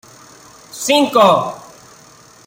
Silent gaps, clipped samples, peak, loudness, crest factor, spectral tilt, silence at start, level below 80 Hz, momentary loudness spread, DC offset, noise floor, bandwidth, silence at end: none; under 0.1%; 0 dBFS; -14 LUFS; 18 dB; -3.5 dB/octave; 0.75 s; -60 dBFS; 23 LU; under 0.1%; -44 dBFS; 16.5 kHz; 0.85 s